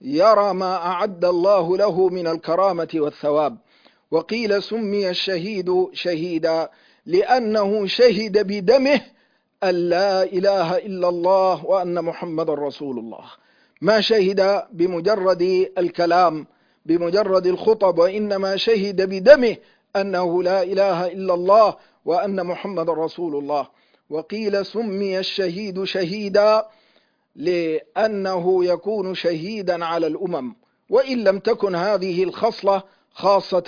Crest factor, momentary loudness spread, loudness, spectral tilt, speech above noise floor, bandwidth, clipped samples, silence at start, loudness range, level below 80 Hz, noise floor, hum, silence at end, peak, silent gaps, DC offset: 20 dB; 9 LU; -20 LUFS; -6 dB/octave; 42 dB; 5.4 kHz; under 0.1%; 0 s; 5 LU; -64 dBFS; -61 dBFS; none; 0 s; 0 dBFS; none; under 0.1%